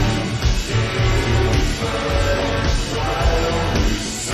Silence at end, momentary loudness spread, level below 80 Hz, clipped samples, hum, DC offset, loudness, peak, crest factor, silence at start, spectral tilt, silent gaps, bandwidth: 0 s; 3 LU; -22 dBFS; under 0.1%; none; under 0.1%; -20 LUFS; -4 dBFS; 14 dB; 0 s; -5 dB/octave; none; 14 kHz